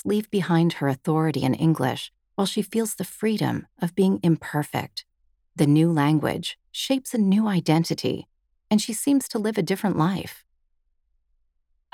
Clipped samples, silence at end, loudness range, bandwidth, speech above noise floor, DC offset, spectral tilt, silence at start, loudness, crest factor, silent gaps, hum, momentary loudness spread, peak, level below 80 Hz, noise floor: under 0.1%; 1.55 s; 3 LU; 17 kHz; 47 dB; under 0.1%; -6 dB/octave; 0.05 s; -24 LUFS; 18 dB; none; none; 10 LU; -6 dBFS; -62 dBFS; -70 dBFS